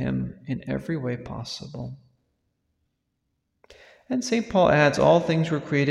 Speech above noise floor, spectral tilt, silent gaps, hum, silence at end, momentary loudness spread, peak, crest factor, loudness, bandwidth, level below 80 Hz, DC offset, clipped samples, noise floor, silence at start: 53 dB; -6 dB/octave; none; none; 0 s; 16 LU; -6 dBFS; 20 dB; -24 LUFS; 12 kHz; -52 dBFS; under 0.1%; under 0.1%; -77 dBFS; 0 s